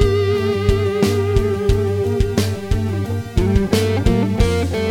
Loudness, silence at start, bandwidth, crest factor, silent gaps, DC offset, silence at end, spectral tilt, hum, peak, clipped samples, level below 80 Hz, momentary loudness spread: -18 LUFS; 0 s; 16.5 kHz; 16 dB; none; under 0.1%; 0 s; -6.5 dB/octave; none; -2 dBFS; under 0.1%; -24 dBFS; 4 LU